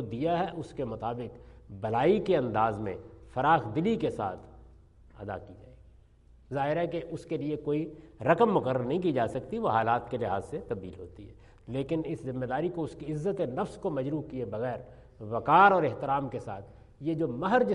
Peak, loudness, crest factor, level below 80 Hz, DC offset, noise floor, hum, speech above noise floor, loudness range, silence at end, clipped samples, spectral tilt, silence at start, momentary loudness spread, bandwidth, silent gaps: -8 dBFS; -30 LUFS; 22 dB; -56 dBFS; under 0.1%; -58 dBFS; none; 28 dB; 7 LU; 0 s; under 0.1%; -7.5 dB/octave; 0 s; 15 LU; 11 kHz; none